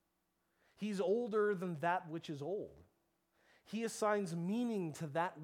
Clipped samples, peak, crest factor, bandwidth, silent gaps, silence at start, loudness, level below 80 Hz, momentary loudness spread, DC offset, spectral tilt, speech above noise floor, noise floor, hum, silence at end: under 0.1%; -22 dBFS; 18 dB; 16 kHz; none; 0.8 s; -39 LUFS; -82 dBFS; 10 LU; under 0.1%; -6 dB/octave; 45 dB; -83 dBFS; none; 0 s